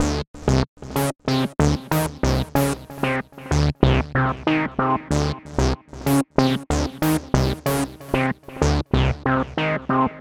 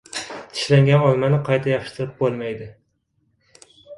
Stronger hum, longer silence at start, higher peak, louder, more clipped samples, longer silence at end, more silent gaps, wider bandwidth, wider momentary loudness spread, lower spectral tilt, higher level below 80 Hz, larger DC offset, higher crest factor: neither; second, 0 s vs 0.15 s; about the same, 0 dBFS vs -2 dBFS; about the same, -22 LUFS vs -20 LUFS; neither; about the same, 0 s vs 0 s; first, 0.27-0.34 s, 0.68-0.77 s vs none; first, 19 kHz vs 11.5 kHz; second, 5 LU vs 15 LU; about the same, -6 dB/octave vs -6.5 dB/octave; first, -30 dBFS vs -56 dBFS; neither; about the same, 20 dB vs 18 dB